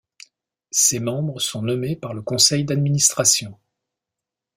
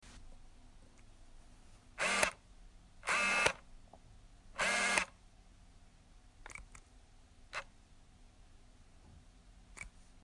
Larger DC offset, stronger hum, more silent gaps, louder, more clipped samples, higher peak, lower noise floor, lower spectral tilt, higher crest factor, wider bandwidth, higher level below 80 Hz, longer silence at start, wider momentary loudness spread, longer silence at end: neither; neither; neither; first, -19 LUFS vs -34 LUFS; neither; first, -2 dBFS vs -12 dBFS; first, -86 dBFS vs -61 dBFS; first, -3 dB/octave vs -1 dB/octave; second, 22 dB vs 30 dB; first, 16 kHz vs 11.5 kHz; about the same, -58 dBFS vs -60 dBFS; first, 0.75 s vs 0.05 s; second, 11 LU vs 27 LU; first, 1.05 s vs 0.05 s